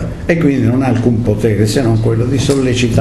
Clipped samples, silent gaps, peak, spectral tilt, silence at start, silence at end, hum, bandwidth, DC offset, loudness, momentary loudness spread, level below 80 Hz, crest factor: under 0.1%; none; 0 dBFS; -6.5 dB/octave; 0 s; 0 s; none; 13 kHz; under 0.1%; -13 LUFS; 2 LU; -30 dBFS; 12 dB